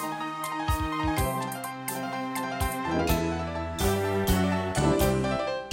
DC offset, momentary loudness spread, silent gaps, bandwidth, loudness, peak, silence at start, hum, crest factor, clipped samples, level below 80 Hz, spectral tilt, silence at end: under 0.1%; 7 LU; none; 16.5 kHz; -28 LUFS; -12 dBFS; 0 s; none; 16 dB; under 0.1%; -38 dBFS; -5 dB/octave; 0 s